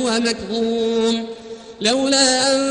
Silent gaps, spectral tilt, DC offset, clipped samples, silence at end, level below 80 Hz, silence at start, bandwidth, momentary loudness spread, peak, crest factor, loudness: none; -2 dB/octave; under 0.1%; under 0.1%; 0 s; -54 dBFS; 0 s; 10 kHz; 15 LU; -4 dBFS; 14 dB; -18 LUFS